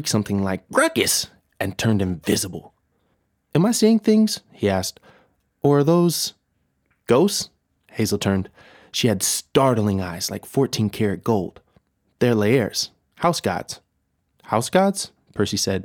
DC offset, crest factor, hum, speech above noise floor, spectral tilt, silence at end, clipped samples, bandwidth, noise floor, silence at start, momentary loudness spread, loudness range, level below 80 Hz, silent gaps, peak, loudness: under 0.1%; 18 dB; none; 51 dB; -4.5 dB/octave; 0 s; under 0.1%; 19.5 kHz; -71 dBFS; 0 s; 12 LU; 3 LU; -56 dBFS; none; -4 dBFS; -21 LUFS